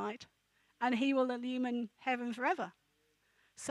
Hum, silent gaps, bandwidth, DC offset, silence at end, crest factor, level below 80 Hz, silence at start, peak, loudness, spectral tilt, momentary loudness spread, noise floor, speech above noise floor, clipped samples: none; none; 11.5 kHz; under 0.1%; 0 s; 16 dB; -86 dBFS; 0 s; -20 dBFS; -36 LUFS; -4 dB/octave; 12 LU; -76 dBFS; 41 dB; under 0.1%